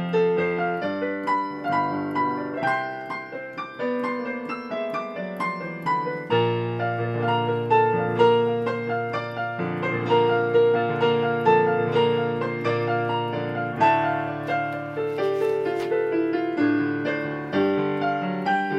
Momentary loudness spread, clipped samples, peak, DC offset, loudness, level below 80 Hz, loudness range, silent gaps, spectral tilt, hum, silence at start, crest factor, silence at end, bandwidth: 9 LU; under 0.1%; -6 dBFS; under 0.1%; -24 LUFS; -66 dBFS; 6 LU; none; -7.5 dB/octave; none; 0 s; 18 dB; 0 s; 8 kHz